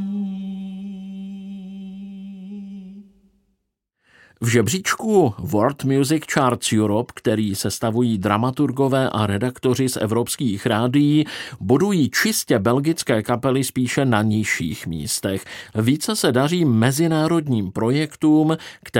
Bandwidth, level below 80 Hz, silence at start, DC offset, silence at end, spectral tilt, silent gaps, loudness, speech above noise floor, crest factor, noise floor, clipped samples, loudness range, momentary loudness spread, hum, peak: 17 kHz; -54 dBFS; 0 s; under 0.1%; 0 s; -5.5 dB/octave; none; -20 LUFS; 56 dB; 18 dB; -75 dBFS; under 0.1%; 10 LU; 16 LU; none; -2 dBFS